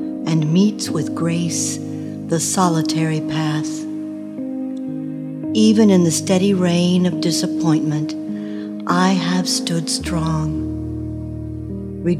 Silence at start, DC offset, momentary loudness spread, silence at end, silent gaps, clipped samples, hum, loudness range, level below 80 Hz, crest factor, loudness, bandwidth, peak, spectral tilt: 0 s; under 0.1%; 12 LU; 0 s; none; under 0.1%; none; 5 LU; -42 dBFS; 16 dB; -19 LUFS; 14.5 kHz; -2 dBFS; -5 dB/octave